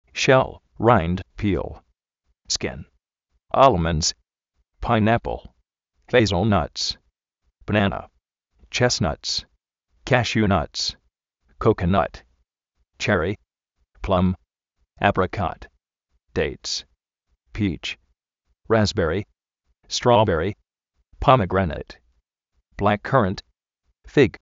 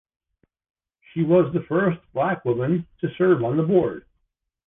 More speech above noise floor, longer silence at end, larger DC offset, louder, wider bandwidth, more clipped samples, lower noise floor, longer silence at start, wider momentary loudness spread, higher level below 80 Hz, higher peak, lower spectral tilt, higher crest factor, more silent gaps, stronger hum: about the same, 52 dB vs 53 dB; second, 0.15 s vs 0.7 s; neither; about the same, -22 LUFS vs -22 LUFS; first, 8 kHz vs 3.8 kHz; neither; about the same, -73 dBFS vs -74 dBFS; second, 0.15 s vs 1.15 s; first, 17 LU vs 9 LU; first, -42 dBFS vs -58 dBFS; first, 0 dBFS vs -6 dBFS; second, -4.5 dB/octave vs -11.5 dB/octave; first, 22 dB vs 16 dB; neither; neither